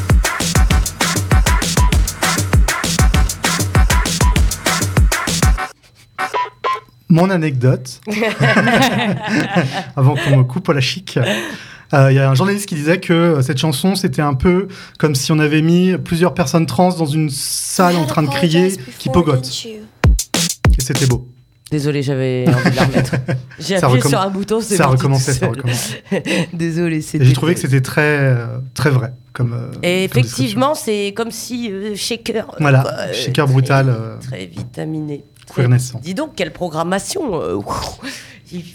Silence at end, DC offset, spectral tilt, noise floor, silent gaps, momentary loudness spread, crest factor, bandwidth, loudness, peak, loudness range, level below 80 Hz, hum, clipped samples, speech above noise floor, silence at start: 0 s; under 0.1%; -5 dB/octave; -44 dBFS; none; 10 LU; 14 dB; 18.5 kHz; -16 LUFS; 0 dBFS; 3 LU; -24 dBFS; none; under 0.1%; 29 dB; 0 s